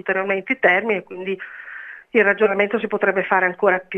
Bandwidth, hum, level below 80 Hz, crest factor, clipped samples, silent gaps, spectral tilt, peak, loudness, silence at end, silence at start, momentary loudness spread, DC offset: 5.8 kHz; none; -68 dBFS; 20 dB; under 0.1%; none; -7 dB/octave; 0 dBFS; -19 LUFS; 0 s; 0.05 s; 15 LU; under 0.1%